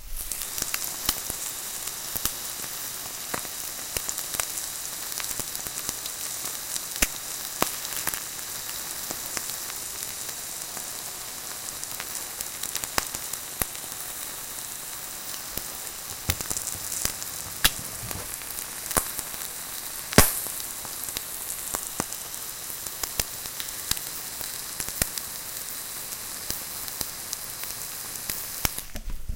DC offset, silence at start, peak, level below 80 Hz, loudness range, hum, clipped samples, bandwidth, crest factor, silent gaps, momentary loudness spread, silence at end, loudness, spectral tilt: under 0.1%; 0 s; 0 dBFS; -44 dBFS; 5 LU; none; under 0.1%; 17 kHz; 32 dB; none; 7 LU; 0 s; -29 LUFS; -1.5 dB/octave